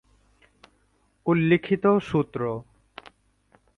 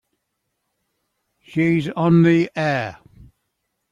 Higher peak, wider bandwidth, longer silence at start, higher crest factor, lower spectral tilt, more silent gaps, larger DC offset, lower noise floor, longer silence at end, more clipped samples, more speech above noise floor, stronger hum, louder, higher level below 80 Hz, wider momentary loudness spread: about the same, -8 dBFS vs -6 dBFS; about the same, 7 kHz vs 7.4 kHz; second, 1.25 s vs 1.5 s; about the same, 20 dB vs 16 dB; about the same, -8.5 dB/octave vs -8 dB/octave; neither; neither; second, -66 dBFS vs -76 dBFS; first, 1.15 s vs 1 s; neither; second, 44 dB vs 58 dB; neither; second, -24 LUFS vs -18 LUFS; about the same, -58 dBFS vs -58 dBFS; first, 25 LU vs 12 LU